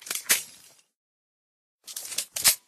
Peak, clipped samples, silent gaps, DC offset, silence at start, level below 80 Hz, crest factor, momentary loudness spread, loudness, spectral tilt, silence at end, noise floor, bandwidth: -4 dBFS; under 0.1%; 0.96-1.79 s; under 0.1%; 0 s; -66 dBFS; 26 dB; 17 LU; -25 LUFS; 2 dB/octave; 0.1 s; -54 dBFS; 14 kHz